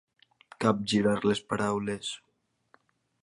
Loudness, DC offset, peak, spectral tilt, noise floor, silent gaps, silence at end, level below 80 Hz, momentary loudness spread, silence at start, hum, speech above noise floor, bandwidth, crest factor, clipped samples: -29 LUFS; under 0.1%; -10 dBFS; -5 dB/octave; -75 dBFS; none; 1.05 s; -64 dBFS; 10 LU; 0.6 s; none; 48 dB; 11.5 kHz; 20 dB; under 0.1%